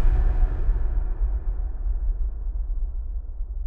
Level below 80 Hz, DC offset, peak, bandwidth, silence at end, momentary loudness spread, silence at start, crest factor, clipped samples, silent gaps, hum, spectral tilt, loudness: -22 dBFS; under 0.1%; -10 dBFS; 2.5 kHz; 0 s; 9 LU; 0 s; 14 dB; under 0.1%; none; none; -10 dB/octave; -30 LUFS